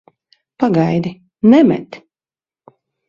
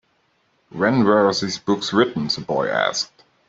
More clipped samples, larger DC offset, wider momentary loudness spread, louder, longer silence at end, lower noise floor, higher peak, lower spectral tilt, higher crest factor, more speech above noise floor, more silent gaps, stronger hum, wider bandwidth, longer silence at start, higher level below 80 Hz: neither; neither; first, 15 LU vs 9 LU; first, -14 LUFS vs -20 LUFS; first, 1.15 s vs 0.45 s; first, under -90 dBFS vs -65 dBFS; first, 0 dBFS vs -4 dBFS; first, -9 dB/octave vs -4.5 dB/octave; about the same, 16 dB vs 18 dB; first, over 77 dB vs 45 dB; neither; neither; second, 7 kHz vs 7.8 kHz; second, 0.6 s vs 0.75 s; about the same, -56 dBFS vs -60 dBFS